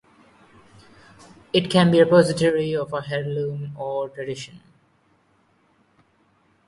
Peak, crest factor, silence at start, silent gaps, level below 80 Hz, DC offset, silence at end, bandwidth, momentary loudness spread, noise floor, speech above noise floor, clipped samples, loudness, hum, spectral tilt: -2 dBFS; 20 dB; 1.55 s; none; -60 dBFS; under 0.1%; 2.1 s; 11.5 kHz; 16 LU; -62 dBFS; 42 dB; under 0.1%; -21 LUFS; none; -6 dB/octave